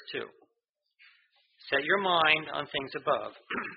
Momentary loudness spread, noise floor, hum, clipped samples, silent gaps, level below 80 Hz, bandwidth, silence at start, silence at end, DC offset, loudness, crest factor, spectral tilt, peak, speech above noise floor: 15 LU; -82 dBFS; none; under 0.1%; 0.69-0.74 s; -70 dBFS; 5.2 kHz; 0 s; 0 s; under 0.1%; -29 LUFS; 24 dB; 0 dB/octave; -8 dBFS; 52 dB